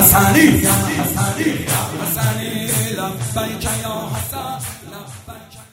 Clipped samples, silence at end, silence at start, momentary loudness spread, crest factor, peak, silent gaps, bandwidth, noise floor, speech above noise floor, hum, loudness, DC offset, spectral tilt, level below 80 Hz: under 0.1%; 0.1 s; 0 s; 22 LU; 18 dB; 0 dBFS; none; 16.5 kHz; -37 dBFS; 22 dB; none; -17 LUFS; under 0.1%; -4 dB/octave; -38 dBFS